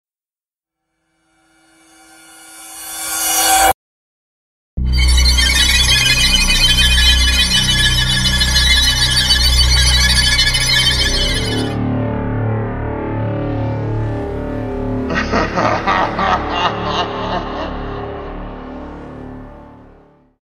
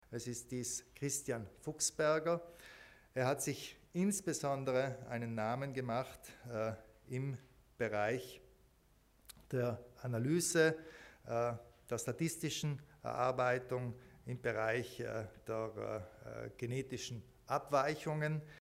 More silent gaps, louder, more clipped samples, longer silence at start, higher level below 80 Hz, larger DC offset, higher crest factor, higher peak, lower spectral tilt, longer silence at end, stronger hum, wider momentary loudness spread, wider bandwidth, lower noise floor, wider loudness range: first, 3.74-4.77 s vs none; first, -13 LUFS vs -39 LUFS; neither; first, 2.4 s vs 0.1 s; first, -22 dBFS vs -70 dBFS; neither; second, 16 dB vs 22 dB; first, 0 dBFS vs -18 dBFS; second, -2.5 dB/octave vs -4.5 dB/octave; first, 0.6 s vs 0 s; neither; first, 17 LU vs 14 LU; about the same, 16 kHz vs 16 kHz; first, under -90 dBFS vs -70 dBFS; first, 10 LU vs 5 LU